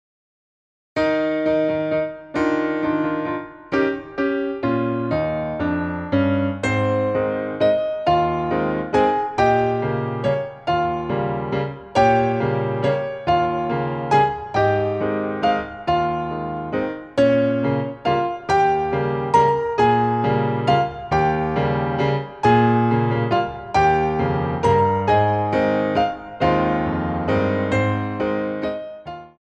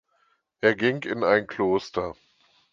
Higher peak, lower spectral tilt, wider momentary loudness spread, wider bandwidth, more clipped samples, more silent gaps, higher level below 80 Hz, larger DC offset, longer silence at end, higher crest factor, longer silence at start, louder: about the same, -4 dBFS vs -4 dBFS; first, -7.5 dB/octave vs -6 dB/octave; about the same, 7 LU vs 9 LU; first, 9.4 kHz vs 7.4 kHz; neither; neither; first, -44 dBFS vs -60 dBFS; neither; second, 0.15 s vs 0.6 s; second, 16 dB vs 22 dB; first, 0.95 s vs 0.65 s; first, -20 LUFS vs -25 LUFS